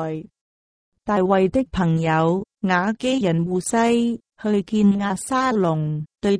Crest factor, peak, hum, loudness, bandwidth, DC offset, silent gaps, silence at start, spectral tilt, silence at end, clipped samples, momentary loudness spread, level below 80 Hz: 14 dB; -6 dBFS; none; -21 LUFS; 10.5 kHz; under 0.1%; 0.41-0.92 s; 0 s; -6 dB/octave; 0 s; under 0.1%; 7 LU; -48 dBFS